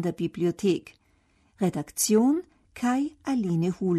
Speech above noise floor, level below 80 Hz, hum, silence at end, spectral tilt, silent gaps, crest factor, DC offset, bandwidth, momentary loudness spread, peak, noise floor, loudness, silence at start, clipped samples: 40 dB; -62 dBFS; none; 0 s; -5.5 dB/octave; none; 16 dB; under 0.1%; 13.5 kHz; 8 LU; -10 dBFS; -65 dBFS; -26 LUFS; 0 s; under 0.1%